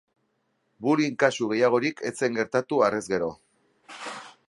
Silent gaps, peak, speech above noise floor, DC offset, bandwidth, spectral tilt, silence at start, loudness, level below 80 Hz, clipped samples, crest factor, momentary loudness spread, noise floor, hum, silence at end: none; -4 dBFS; 49 dB; under 0.1%; 11.5 kHz; -5 dB/octave; 0.8 s; -25 LUFS; -68 dBFS; under 0.1%; 22 dB; 15 LU; -73 dBFS; none; 0.2 s